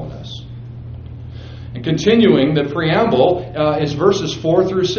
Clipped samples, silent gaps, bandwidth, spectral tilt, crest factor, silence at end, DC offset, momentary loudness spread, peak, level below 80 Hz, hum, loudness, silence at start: under 0.1%; none; 7 kHz; -5.5 dB/octave; 16 dB; 0 s; under 0.1%; 20 LU; 0 dBFS; -42 dBFS; none; -15 LUFS; 0 s